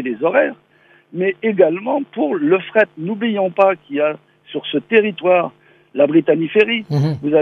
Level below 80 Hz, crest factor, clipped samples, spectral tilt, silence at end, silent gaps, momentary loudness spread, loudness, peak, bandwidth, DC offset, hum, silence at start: -66 dBFS; 16 dB; under 0.1%; -8 dB/octave; 0 s; none; 8 LU; -17 LUFS; 0 dBFS; 6.6 kHz; under 0.1%; none; 0 s